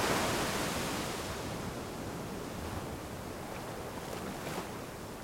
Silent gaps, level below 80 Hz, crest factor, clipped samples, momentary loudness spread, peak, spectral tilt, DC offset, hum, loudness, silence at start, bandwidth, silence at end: none; -54 dBFS; 18 dB; under 0.1%; 10 LU; -20 dBFS; -4 dB/octave; under 0.1%; none; -38 LUFS; 0 s; 16.5 kHz; 0 s